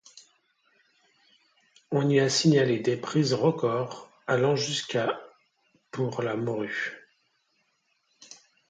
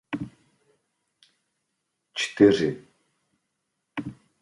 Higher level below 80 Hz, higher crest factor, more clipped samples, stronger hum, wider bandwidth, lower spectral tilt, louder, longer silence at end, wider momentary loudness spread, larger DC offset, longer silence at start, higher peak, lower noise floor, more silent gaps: second, -72 dBFS vs -62 dBFS; second, 18 dB vs 24 dB; neither; neither; second, 9.4 kHz vs 11.5 kHz; about the same, -5 dB/octave vs -5.5 dB/octave; about the same, -26 LUFS vs -24 LUFS; about the same, 0.35 s vs 0.3 s; second, 14 LU vs 22 LU; neither; about the same, 0.15 s vs 0.1 s; second, -10 dBFS vs -4 dBFS; second, -73 dBFS vs -79 dBFS; neither